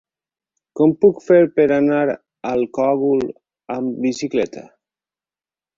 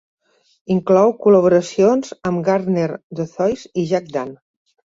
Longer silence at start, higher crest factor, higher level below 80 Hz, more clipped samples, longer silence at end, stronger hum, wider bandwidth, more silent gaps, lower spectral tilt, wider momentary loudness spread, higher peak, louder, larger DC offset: about the same, 0.75 s vs 0.7 s; about the same, 16 dB vs 16 dB; about the same, -60 dBFS vs -58 dBFS; neither; first, 1.15 s vs 0.6 s; neither; about the same, 7.6 kHz vs 7.8 kHz; second, none vs 3.03-3.10 s; about the same, -7 dB/octave vs -7 dB/octave; about the same, 13 LU vs 13 LU; about the same, -2 dBFS vs -2 dBFS; about the same, -18 LUFS vs -17 LUFS; neither